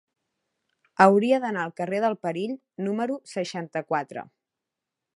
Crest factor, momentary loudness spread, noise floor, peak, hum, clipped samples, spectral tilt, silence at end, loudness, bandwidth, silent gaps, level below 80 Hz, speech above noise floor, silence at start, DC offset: 26 dB; 14 LU; -86 dBFS; -2 dBFS; none; under 0.1%; -6 dB/octave; 0.95 s; -25 LUFS; 11.5 kHz; none; -76 dBFS; 62 dB; 1 s; under 0.1%